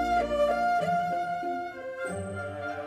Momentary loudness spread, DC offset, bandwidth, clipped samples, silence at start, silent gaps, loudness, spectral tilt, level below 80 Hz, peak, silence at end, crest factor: 10 LU; under 0.1%; 14 kHz; under 0.1%; 0 s; none; -29 LUFS; -5.5 dB/octave; -52 dBFS; -16 dBFS; 0 s; 14 dB